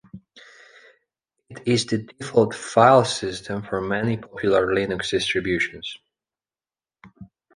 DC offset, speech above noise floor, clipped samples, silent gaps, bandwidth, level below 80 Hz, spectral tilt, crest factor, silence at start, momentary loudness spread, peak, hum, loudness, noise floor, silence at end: under 0.1%; over 69 dB; under 0.1%; none; 10.5 kHz; -54 dBFS; -5 dB/octave; 22 dB; 0.15 s; 14 LU; -2 dBFS; none; -22 LUFS; under -90 dBFS; 0.3 s